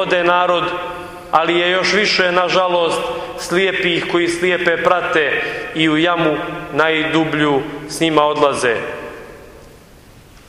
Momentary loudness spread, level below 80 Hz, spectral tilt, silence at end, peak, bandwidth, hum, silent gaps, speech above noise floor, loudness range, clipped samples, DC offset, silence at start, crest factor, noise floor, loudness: 10 LU; -48 dBFS; -4 dB/octave; 0.1 s; 0 dBFS; 15.5 kHz; none; none; 27 dB; 2 LU; under 0.1%; under 0.1%; 0 s; 16 dB; -43 dBFS; -16 LUFS